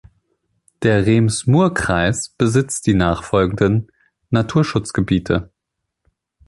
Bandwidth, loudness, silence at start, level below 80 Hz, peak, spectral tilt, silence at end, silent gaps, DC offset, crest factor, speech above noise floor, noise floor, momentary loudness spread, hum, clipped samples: 11.5 kHz; -17 LUFS; 0.8 s; -38 dBFS; -2 dBFS; -6 dB/octave; 1.05 s; none; under 0.1%; 16 dB; 62 dB; -78 dBFS; 6 LU; none; under 0.1%